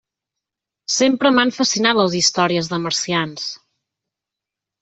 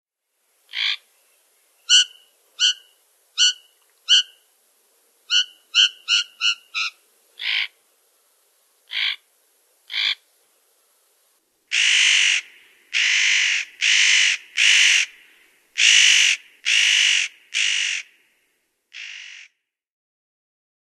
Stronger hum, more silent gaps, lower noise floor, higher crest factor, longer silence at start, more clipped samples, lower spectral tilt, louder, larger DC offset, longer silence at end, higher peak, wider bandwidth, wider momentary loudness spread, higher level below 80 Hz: neither; neither; first, -85 dBFS vs -71 dBFS; about the same, 18 dB vs 20 dB; first, 0.9 s vs 0.75 s; neither; first, -3 dB/octave vs 8.5 dB/octave; about the same, -17 LUFS vs -17 LUFS; neither; second, 1.25 s vs 1.55 s; about the same, -2 dBFS vs -2 dBFS; second, 8.4 kHz vs 13.5 kHz; second, 13 LU vs 17 LU; first, -62 dBFS vs -88 dBFS